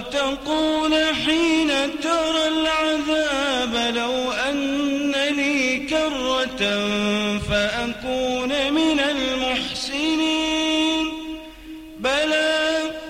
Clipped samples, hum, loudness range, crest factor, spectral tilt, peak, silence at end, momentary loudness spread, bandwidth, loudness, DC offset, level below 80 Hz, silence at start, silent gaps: under 0.1%; none; 2 LU; 14 dB; -3 dB/octave; -8 dBFS; 0 s; 5 LU; 15.5 kHz; -21 LUFS; under 0.1%; -46 dBFS; 0 s; none